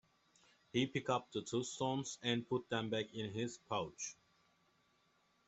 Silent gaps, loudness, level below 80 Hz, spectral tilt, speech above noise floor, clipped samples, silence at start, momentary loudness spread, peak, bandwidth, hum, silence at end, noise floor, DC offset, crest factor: none; -41 LUFS; -76 dBFS; -4.5 dB/octave; 36 dB; under 0.1%; 0.75 s; 6 LU; -22 dBFS; 8.2 kHz; none; 1.35 s; -76 dBFS; under 0.1%; 20 dB